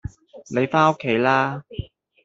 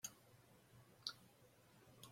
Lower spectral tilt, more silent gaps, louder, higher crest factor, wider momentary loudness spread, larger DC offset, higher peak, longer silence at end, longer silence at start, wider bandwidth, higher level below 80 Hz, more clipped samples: first, -6.5 dB/octave vs -1 dB/octave; neither; first, -20 LUFS vs -53 LUFS; second, 20 dB vs 34 dB; about the same, 18 LU vs 17 LU; neither; first, -2 dBFS vs -26 dBFS; first, 0.4 s vs 0 s; about the same, 0.05 s vs 0 s; second, 7.8 kHz vs 16.5 kHz; first, -48 dBFS vs -86 dBFS; neither